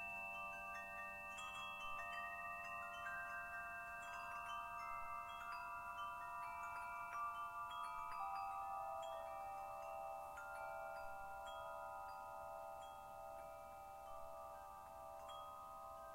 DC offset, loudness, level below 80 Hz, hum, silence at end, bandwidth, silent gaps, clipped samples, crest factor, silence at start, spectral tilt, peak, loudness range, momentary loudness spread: under 0.1%; -50 LUFS; -72 dBFS; none; 0 s; 16 kHz; none; under 0.1%; 16 dB; 0 s; -2.5 dB/octave; -36 dBFS; 6 LU; 7 LU